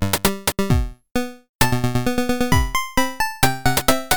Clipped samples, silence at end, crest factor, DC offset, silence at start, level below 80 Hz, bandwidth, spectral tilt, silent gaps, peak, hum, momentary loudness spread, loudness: under 0.1%; 0 s; 18 dB; 4%; 0 s; -30 dBFS; 19.5 kHz; -4 dB/octave; 1.49-1.59 s; -2 dBFS; none; 8 LU; -20 LUFS